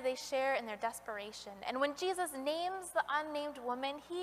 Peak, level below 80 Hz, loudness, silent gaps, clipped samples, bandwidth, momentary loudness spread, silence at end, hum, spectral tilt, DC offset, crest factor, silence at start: -20 dBFS; -74 dBFS; -38 LUFS; none; under 0.1%; 15.5 kHz; 9 LU; 0 s; 60 Hz at -70 dBFS; -2 dB/octave; under 0.1%; 18 dB; 0 s